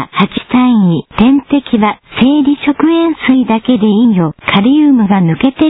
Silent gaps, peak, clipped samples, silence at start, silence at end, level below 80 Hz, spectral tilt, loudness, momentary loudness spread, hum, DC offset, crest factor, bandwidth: none; 0 dBFS; 0.1%; 0 s; 0 s; -40 dBFS; -10 dB/octave; -10 LUFS; 4 LU; none; under 0.1%; 10 dB; 4 kHz